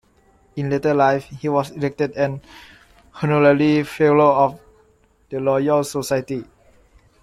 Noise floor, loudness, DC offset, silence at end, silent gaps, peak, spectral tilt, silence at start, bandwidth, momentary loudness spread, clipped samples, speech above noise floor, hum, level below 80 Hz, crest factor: -57 dBFS; -19 LUFS; under 0.1%; 0.8 s; none; -2 dBFS; -6.5 dB/octave; 0.55 s; 14.5 kHz; 14 LU; under 0.1%; 39 dB; none; -54 dBFS; 18 dB